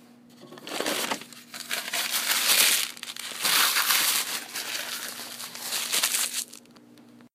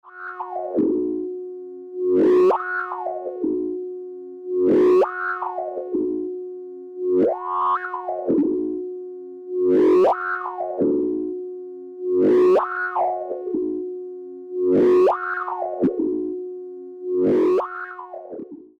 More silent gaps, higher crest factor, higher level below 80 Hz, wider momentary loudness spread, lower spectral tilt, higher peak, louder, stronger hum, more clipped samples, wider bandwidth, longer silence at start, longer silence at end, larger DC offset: neither; first, 24 dB vs 10 dB; second, -86 dBFS vs -62 dBFS; second, 15 LU vs 19 LU; second, 1.5 dB/octave vs -8 dB/octave; first, -4 dBFS vs -12 dBFS; second, -24 LUFS vs -21 LUFS; neither; neither; first, 16 kHz vs 5.2 kHz; first, 0.35 s vs 0.05 s; about the same, 0.1 s vs 0.15 s; neither